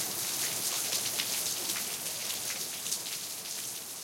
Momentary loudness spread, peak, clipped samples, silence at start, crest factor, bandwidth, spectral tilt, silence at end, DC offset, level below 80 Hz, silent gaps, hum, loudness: 6 LU; -12 dBFS; under 0.1%; 0 s; 22 dB; 17 kHz; 0.5 dB/octave; 0 s; under 0.1%; -74 dBFS; none; none; -32 LUFS